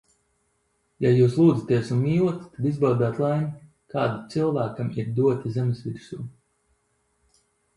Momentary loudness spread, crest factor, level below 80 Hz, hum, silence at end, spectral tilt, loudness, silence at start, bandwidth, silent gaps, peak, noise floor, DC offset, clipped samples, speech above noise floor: 15 LU; 18 dB; -60 dBFS; none; 1.45 s; -9 dB/octave; -24 LUFS; 1 s; 11 kHz; none; -8 dBFS; -71 dBFS; under 0.1%; under 0.1%; 48 dB